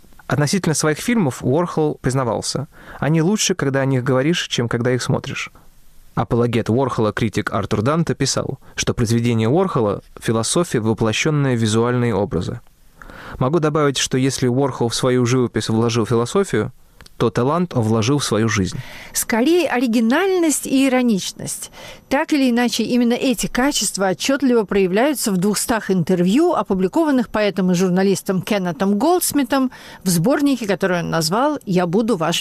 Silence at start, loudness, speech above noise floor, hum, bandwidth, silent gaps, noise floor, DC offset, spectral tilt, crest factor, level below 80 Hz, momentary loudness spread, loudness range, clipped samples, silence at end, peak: 0.3 s; -18 LUFS; 25 dB; none; 15.5 kHz; none; -43 dBFS; under 0.1%; -5 dB/octave; 12 dB; -46 dBFS; 7 LU; 2 LU; under 0.1%; 0 s; -8 dBFS